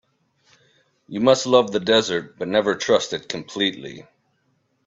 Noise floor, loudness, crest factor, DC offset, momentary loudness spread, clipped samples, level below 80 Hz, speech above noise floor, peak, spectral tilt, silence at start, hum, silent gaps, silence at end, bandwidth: -68 dBFS; -20 LUFS; 20 dB; under 0.1%; 13 LU; under 0.1%; -64 dBFS; 47 dB; -2 dBFS; -3.5 dB/octave; 1.1 s; none; none; 0.85 s; 8 kHz